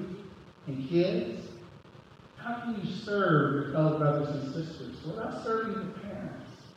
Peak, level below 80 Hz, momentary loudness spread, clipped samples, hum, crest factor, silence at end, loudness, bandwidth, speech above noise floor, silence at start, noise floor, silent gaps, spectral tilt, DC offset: -12 dBFS; -64 dBFS; 19 LU; under 0.1%; none; 20 dB; 0.05 s; -31 LUFS; 8.4 kHz; 23 dB; 0 s; -53 dBFS; none; -8 dB/octave; under 0.1%